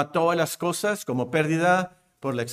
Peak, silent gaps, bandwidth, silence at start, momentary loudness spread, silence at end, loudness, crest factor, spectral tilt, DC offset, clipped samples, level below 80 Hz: -8 dBFS; none; 16 kHz; 0 s; 9 LU; 0 s; -24 LUFS; 16 dB; -5 dB/octave; under 0.1%; under 0.1%; -66 dBFS